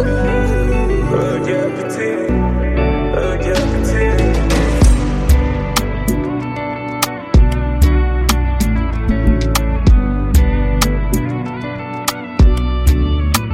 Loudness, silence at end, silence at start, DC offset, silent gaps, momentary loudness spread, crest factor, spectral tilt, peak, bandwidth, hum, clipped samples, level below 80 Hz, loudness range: -16 LUFS; 0 s; 0 s; under 0.1%; none; 6 LU; 12 dB; -6 dB/octave; 0 dBFS; 16 kHz; none; under 0.1%; -16 dBFS; 2 LU